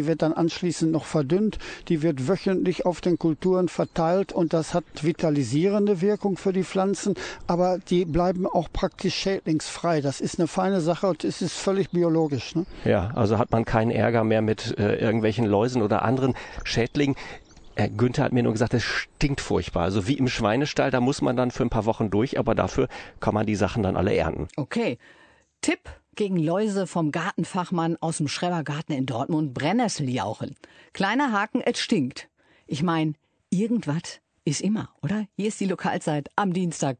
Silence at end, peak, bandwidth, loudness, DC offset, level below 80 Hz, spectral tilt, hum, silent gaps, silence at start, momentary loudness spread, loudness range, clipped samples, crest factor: 0.05 s; -6 dBFS; 9.4 kHz; -25 LUFS; under 0.1%; -46 dBFS; -6 dB/octave; none; none; 0 s; 7 LU; 4 LU; under 0.1%; 18 dB